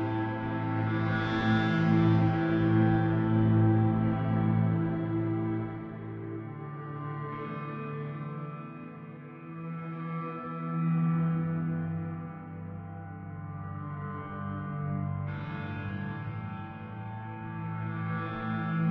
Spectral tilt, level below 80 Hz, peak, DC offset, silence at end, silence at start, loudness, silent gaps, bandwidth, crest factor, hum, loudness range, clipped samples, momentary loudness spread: -10 dB/octave; -56 dBFS; -14 dBFS; under 0.1%; 0 s; 0 s; -31 LUFS; none; 5.6 kHz; 16 dB; none; 13 LU; under 0.1%; 16 LU